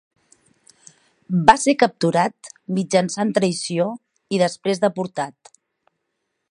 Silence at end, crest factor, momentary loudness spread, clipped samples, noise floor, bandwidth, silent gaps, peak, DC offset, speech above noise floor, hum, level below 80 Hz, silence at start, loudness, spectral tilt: 1.2 s; 22 dB; 12 LU; under 0.1%; -76 dBFS; 11 kHz; none; 0 dBFS; under 0.1%; 56 dB; none; -58 dBFS; 1.3 s; -20 LUFS; -5 dB/octave